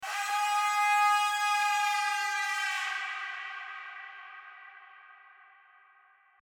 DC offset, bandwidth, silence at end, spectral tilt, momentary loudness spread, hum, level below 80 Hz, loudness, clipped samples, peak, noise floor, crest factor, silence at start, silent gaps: under 0.1%; 19.5 kHz; 1.25 s; 5.5 dB/octave; 21 LU; none; under -90 dBFS; -28 LUFS; under 0.1%; -16 dBFS; -63 dBFS; 16 dB; 0 s; none